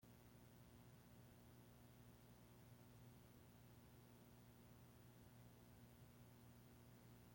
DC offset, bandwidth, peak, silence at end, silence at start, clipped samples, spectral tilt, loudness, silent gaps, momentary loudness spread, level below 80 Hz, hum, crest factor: under 0.1%; 16.5 kHz; -54 dBFS; 0 s; 0 s; under 0.1%; -5.5 dB/octave; -67 LUFS; none; 1 LU; -78 dBFS; 60 Hz at -70 dBFS; 14 dB